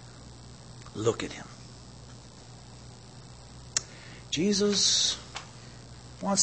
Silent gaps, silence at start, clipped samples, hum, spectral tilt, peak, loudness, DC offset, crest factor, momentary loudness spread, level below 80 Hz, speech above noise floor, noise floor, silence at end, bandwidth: none; 0 s; under 0.1%; none; -2.5 dB/octave; -8 dBFS; -27 LUFS; under 0.1%; 24 dB; 25 LU; -56 dBFS; 21 dB; -48 dBFS; 0 s; 8.8 kHz